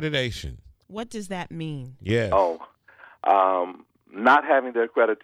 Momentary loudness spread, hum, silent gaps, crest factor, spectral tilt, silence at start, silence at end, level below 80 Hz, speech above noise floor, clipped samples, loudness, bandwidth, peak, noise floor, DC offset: 18 LU; none; none; 18 dB; -5.5 dB/octave; 0 s; 0.1 s; -50 dBFS; 29 dB; under 0.1%; -23 LUFS; 14 kHz; -6 dBFS; -52 dBFS; under 0.1%